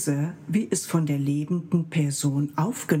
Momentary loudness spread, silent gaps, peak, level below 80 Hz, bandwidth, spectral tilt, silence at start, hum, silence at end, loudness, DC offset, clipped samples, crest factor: 3 LU; none; -8 dBFS; -70 dBFS; 16.5 kHz; -6 dB/octave; 0 s; none; 0 s; -26 LUFS; under 0.1%; under 0.1%; 16 dB